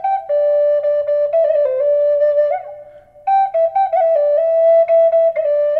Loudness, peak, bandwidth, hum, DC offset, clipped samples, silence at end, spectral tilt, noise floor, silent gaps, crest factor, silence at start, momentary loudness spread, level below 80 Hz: -15 LUFS; -6 dBFS; 4.3 kHz; none; under 0.1%; under 0.1%; 0 s; -4.5 dB/octave; -40 dBFS; none; 8 dB; 0 s; 6 LU; -62 dBFS